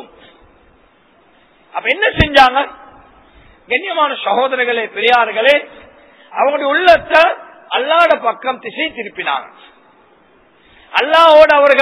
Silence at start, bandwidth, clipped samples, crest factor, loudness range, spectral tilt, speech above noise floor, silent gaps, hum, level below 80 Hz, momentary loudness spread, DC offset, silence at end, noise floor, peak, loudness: 0 s; 5.4 kHz; 0.6%; 14 dB; 5 LU; -5 dB/octave; 39 dB; none; none; -40 dBFS; 13 LU; under 0.1%; 0 s; -51 dBFS; 0 dBFS; -12 LUFS